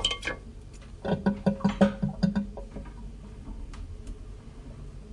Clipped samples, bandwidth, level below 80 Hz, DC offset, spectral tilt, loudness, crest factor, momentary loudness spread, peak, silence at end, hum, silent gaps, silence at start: under 0.1%; 11 kHz; -42 dBFS; under 0.1%; -6 dB/octave; -29 LUFS; 24 dB; 21 LU; -6 dBFS; 0 s; none; none; 0 s